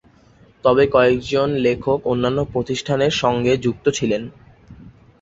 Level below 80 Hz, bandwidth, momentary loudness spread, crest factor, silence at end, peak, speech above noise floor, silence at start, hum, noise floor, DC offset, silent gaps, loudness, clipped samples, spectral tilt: -46 dBFS; 8 kHz; 8 LU; 18 dB; 0.3 s; -2 dBFS; 33 dB; 0.65 s; none; -51 dBFS; under 0.1%; none; -19 LUFS; under 0.1%; -5.5 dB/octave